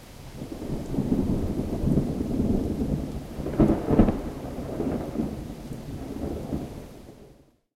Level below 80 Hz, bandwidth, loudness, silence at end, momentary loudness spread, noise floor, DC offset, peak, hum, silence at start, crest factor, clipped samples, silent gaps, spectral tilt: -36 dBFS; 16 kHz; -28 LUFS; 0.45 s; 16 LU; -55 dBFS; under 0.1%; -4 dBFS; none; 0 s; 22 dB; under 0.1%; none; -8.5 dB/octave